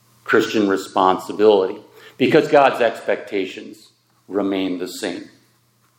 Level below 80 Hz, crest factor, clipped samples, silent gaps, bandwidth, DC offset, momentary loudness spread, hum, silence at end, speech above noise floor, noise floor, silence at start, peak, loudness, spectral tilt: -72 dBFS; 18 dB; under 0.1%; none; 17 kHz; under 0.1%; 13 LU; none; 0.7 s; 42 dB; -60 dBFS; 0.25 s; 0 dBFS; -18 LUFS; -5 dB/octave